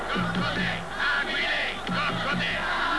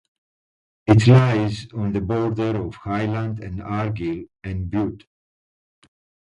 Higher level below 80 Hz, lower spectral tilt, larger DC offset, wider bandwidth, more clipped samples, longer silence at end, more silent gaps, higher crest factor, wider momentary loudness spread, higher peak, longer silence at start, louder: about the same, -46 dBFS vs -44 dBFS; second, -4.5 dB/octave vs -8 dB/octave; first, 0.8% vs under 0.1%; about the same, 11 kHz vs 10 kHz; neither; second, 0 s vs 1.35 s; neither; second, 12 dB vs 20 dB; second, 3 LU vs 15 LU; second, -14 dBFS vs 0 dBFS; second, 0 s vs 0.85 s; second, -26 LUFS vs -21 LUFS